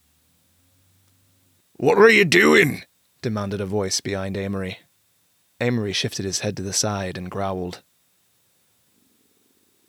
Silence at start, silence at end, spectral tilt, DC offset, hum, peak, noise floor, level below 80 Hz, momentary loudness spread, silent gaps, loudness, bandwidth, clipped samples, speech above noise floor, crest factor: 1.8 s; 2.1 s; -4 dB/octave; under 0.1%; none; -4 dBFS; -64 dBFS; -62 dBFS; 18 LU; none; -20 LUFS; 17.5 kHz; under 0.1%; 44 dB; 20 dB